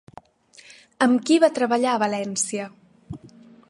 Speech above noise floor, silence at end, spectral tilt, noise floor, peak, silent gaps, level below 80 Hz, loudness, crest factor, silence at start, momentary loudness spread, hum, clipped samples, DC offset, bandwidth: 32 dB; 0.4 s; -3.5 dB/octave; -52 dBFS; -4 dBFS; none; -62 dBFS; -21 LUFS; 20 dB; 1 s; 23 LU; none; under 0.1%; under 0.1%; 11.5 kHz